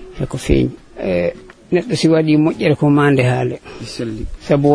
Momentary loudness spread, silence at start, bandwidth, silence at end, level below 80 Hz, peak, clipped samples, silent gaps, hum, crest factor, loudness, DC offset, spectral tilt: 13 LU; 0 s; 11 kHz; 0 s; -32 dBFS; 0 dBFS; under 0.1%; none; none; 16 dB; -16 LUFS; under 0.1%; -7 dB/octave